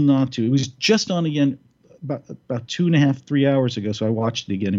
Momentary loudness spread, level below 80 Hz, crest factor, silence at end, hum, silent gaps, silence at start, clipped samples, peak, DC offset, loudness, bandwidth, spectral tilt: 12 LU; -64 dBFS; 16 dB; 0 s; none; none; 0 s; under 0.1%; -4 dBFS; under 0.1%; -21 LUFS; 7.6 kHz; -6 dB/octave